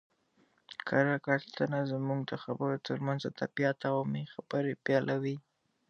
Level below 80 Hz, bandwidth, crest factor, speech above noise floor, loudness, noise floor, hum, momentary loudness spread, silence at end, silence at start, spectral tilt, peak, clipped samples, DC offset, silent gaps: -78 dBFS; 7 kHz; 22 dB; 38 dB; -33 LUFS; -71 dBFS; none; 8 LU; 0.5 s; 0.7 s; -7.5 dB/octave; -12 dBFS; under 0.1%; under 0.1%; none